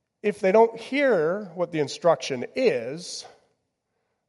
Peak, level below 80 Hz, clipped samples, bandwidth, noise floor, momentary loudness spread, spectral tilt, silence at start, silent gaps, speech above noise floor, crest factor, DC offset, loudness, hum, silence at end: -8 dBFS; -76 dBFS; under 0.1%; 11.5 kHz; -77 dBFS; 13 LU; -5 dB/octave; 0.25 s; none; 53 dB; 18 dB; under 0.1%; -24 LUFS; none; 1 s